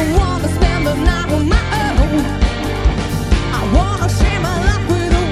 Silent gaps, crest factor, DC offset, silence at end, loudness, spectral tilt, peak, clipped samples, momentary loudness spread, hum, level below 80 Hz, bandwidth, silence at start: none; 14 dB; 0.1%; 0 s; -16 LUFS; -6 dB/octave; 0 dBFS; under 0.1%; 2 LU; none; -18 dBFS; 15 kHz; 0 s